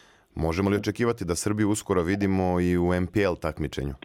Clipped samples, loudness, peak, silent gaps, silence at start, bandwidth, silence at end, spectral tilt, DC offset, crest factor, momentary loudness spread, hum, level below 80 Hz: under 0.1%; -26 LUFS; -12 dBFS; none; 0.35 s; 16.5 kHz; 0.1 s; -6 dB/octave; under 0.1%; 14 dB; 7 LU; none; -46 dBFS